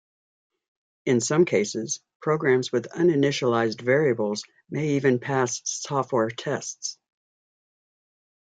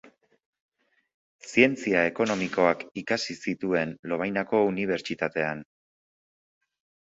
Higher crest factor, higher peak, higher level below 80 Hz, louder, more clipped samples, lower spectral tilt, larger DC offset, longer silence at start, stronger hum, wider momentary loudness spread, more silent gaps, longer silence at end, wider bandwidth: second, 18 dB vs 24 dB; second, -8 dBFS vs -4 dBFS; about the same, -70 dBFS vs -66 dBFS; about the same, -24 LUFS vs -26 LUFS; neither; about the same, -4.5 dB/octave vs -5 dB/octave; neither; second, 1.05 s vs 1.45 s; neither; about the same, 10 LU vs 9 LU; about the same, 2.15-2.20 s vs 3.99-4.03 s; about the same, 1.5 s vs 1.4 s; first, 9.4 kHz vs 8 kHz